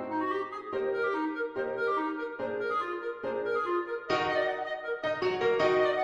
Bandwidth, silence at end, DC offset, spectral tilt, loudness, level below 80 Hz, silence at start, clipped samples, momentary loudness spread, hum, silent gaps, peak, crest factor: 8 kHz; 0 s; under 0.1%; -5.5 dB/octave; -31 LUFS; -68 dBFS; 0 s; under 0.1%; 8 LU; none; none; -12 dBFS; 18 dB